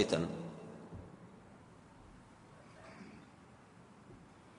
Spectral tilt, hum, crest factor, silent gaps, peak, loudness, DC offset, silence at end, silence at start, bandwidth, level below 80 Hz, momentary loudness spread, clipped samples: -5.5 dB/octave; none; 28 dB; none; -16 dBFS; -44 LUFS; under 0.1%; 0 s; 0 s; 10.5 kHz; -68 dBFS; 18 LU; under 0.1%